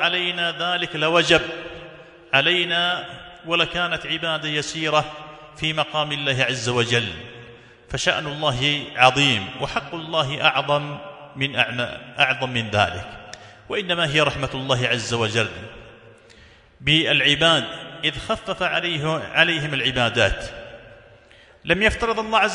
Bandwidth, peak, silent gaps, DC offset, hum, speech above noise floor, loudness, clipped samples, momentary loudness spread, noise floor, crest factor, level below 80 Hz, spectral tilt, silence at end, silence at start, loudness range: 11 kHz; 0 dBFS; none; under 0.1%; none; 29 dB; -20 LUFS; under 0.1%; 17 LU; -50 dBFS; 22 dB; -46 dBFS; -3.5 dB/octave; 0 s; 0 s; 3 LU